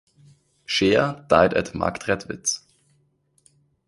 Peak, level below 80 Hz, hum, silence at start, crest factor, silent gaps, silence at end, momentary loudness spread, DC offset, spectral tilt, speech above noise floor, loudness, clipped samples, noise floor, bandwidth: 0 dBFS; -50 dBFS; none; 0.7 s; 24 dB; none; 1.3 s; 9 LU; under 0.1%; -3.5 dB/octave; 44 dB; -22 LUFS; under 0.1%; -65 dBFS; 11.5 kHz